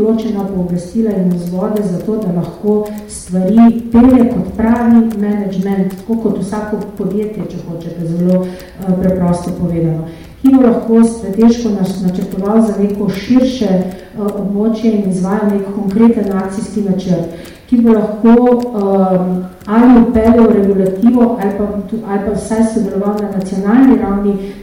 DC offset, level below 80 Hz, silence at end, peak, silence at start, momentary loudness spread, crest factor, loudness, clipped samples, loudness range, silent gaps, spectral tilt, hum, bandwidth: under 0.1%; -36 dBFS; 0 s; -2 dBFS; 0 s; 11 LU; 10 dB; -13 LUFS; under 0.1%; 6 LU; none; -8 dB/octave; none; 15.5 kHz